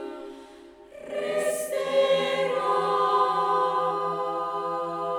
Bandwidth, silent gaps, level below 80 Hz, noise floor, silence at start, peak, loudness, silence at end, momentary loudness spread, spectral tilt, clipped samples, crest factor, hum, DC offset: 19 kHz; none; -68 dBFS; -48 dBFS; 0 s; -12 dBFS; -25 LUFS; 0 s; 15 LU; -3.5 dB/octave; under 0.1%; 14 dB; none; under 0.1%